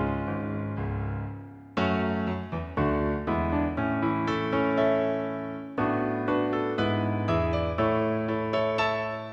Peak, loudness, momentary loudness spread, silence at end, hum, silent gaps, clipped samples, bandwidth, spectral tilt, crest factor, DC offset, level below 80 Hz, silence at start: -12 dBFS; -28 LUFS; 7 LU; 0 s; none; none; under 0.1%; 7.8 kHz; -8 dB/octave; 14 dB; under 0.1%; -44 dBFS; 0 s